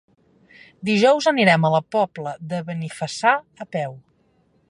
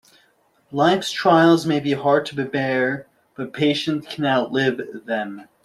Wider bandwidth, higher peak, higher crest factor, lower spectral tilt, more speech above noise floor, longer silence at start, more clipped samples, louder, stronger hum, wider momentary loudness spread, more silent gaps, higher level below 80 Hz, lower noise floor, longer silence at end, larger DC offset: second, 11.5 kHz vs 13 kHz; about the same, -2 dBFS vs -2 dBFS; about the same, 20 dB vs 18 dB; about the same, -5.5 dB/octave vs -5.5 dB/octave; about the same, 42 dB vs 41 dB; about the same, 0.8 s vs 0.7 s; neither; about the same, -20 LUFS vs -20 LUFS; neither; about the same, 14 LU vs 15 LU; neither; second, -68 dBFS vs -62 dBFS; about the same, -62 dBFS vs -61 dBFS; first, 0.7 s vs 0.2 s; neither